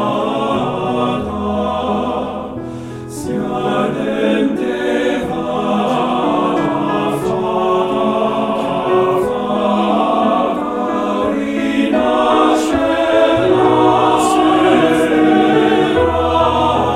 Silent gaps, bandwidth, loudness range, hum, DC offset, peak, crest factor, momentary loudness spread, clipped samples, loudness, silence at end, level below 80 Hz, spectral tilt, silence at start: none; 14.5 kHz; 7 LU; none; under 0.1%; 0 dBFS; 14 dB; 7 LU; under 0.1%; -15 LUFS; 0 s; -40 dBFS; -6 dB/octave; 0 s